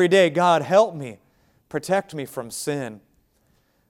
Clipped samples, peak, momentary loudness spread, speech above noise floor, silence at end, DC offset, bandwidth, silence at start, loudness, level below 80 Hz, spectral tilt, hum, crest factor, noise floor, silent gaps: under 0.1%; -4 dBFS; 17 LU; 43 dB; 0.9 s; under 0.1%; 16.5 kHz; 0 s; -22 LUFS; -66 dBFS; -5 dB/octave; none; 20 dB; -64 dBFS; none